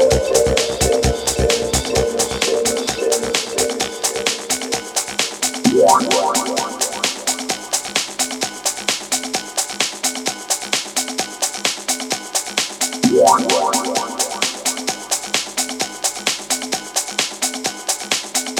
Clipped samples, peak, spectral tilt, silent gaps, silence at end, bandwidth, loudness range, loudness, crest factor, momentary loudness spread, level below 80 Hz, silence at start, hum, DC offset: under 0.1%; 0 dBFS; -2 dB/octave; none; 0 s; over 20 kHz; 3 LU; -18 LUFS; 18 dB; 7 LU; -36 dBFS; 0 s; none; under 0.1%